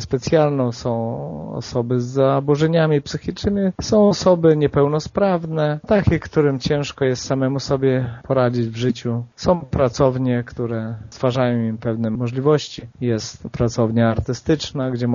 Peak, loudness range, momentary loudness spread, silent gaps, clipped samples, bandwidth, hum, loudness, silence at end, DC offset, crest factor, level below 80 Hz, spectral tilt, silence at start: -2 dBFS; 4 LU; 9 LU; none; under 0.1%; 7.4 kHz; none; -19 LUFS; 0 s; under 0.1%; 18 dB; -42 dBFS; -6.5 dB/octave; 0 s